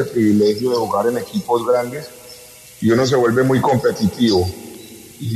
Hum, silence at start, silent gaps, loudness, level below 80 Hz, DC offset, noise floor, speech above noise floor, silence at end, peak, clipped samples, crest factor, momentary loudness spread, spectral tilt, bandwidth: none; 0 s; none; -17 LUFS; -50 dBFS; under 0.1%; -40 dBFS; 24 dB; 0 s; -4 dBFS; under 0.1%; 14 dB; 21 LU; -6 dB/octave; 13.5 kHz